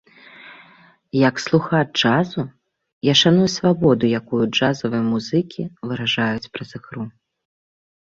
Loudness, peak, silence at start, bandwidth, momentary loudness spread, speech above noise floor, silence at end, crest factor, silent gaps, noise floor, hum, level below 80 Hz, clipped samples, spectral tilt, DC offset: -19 LUFS; -2 dBFS; 0.4 s; 7.8 kHz; 17 LU; 32 dB; 1.05 s; 18 dB; 2.92-3.01 s; -51 dBFS; none; -56 dBFS; under 0.1%; -5.5 dB/octave; under 0.1%